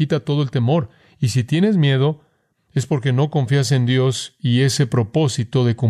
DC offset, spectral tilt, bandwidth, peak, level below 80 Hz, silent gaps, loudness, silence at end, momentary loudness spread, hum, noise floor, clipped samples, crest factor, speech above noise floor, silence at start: under 0.1%; -6 dB/octave; 13.5 kHz; -4 dBFS; -56 dBFS; none; -19 LUFS; 0 s; 7 LU; none; -62 dBFS; under 0.1%; 14 dB; 45 dB; 0 s